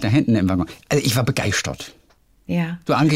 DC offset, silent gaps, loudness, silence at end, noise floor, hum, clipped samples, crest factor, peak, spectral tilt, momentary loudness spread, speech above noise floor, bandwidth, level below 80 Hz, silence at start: under 0.1%; none; -21 LUFS; 0 s; -54 dBFS; none; under 0.1%; 14 dB; -6 dBFS; -5.5 dB/octave; 10 LU; 35 dB; 16 kHz; -48 dBFS; 0 s